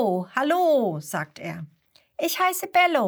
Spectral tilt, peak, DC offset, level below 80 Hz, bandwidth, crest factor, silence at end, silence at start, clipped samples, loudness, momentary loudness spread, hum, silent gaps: -4 dB/octave; -6 dBFS; under 0.1%; -74 dBFS; over 20 kHz; 18 dB; 0 s; 0 s; under 0.1%; -23 LUFS; 17 LU; none; none